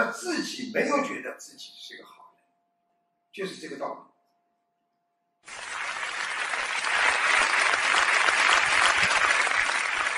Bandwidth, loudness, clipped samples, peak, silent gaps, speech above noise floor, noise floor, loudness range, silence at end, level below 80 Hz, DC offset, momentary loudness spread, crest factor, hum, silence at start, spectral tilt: 14.5 kHz; -23 LUFS; under 0.1%; -6 dBFS; none; 45 dB; -76 dBFS; 20 LU; 0 s; -64 dBFS; under 0.1%; 21 LU; 20 dB; none; 0 s; -0.5 dB/octave